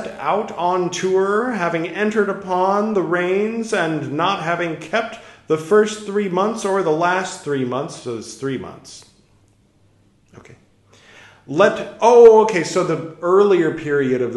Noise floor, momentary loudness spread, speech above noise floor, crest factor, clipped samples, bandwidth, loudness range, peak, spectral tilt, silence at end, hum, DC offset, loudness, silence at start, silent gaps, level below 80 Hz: -56 dBFS; 12 LU; 39 dB; 18 dB; under 0.1%; 11.5 kHz; 14 LU; 0 dBFS; -5 dB/octave; 0 s; none; under 0.1%; -18 LUFS; 0 s; none; -60 dBFS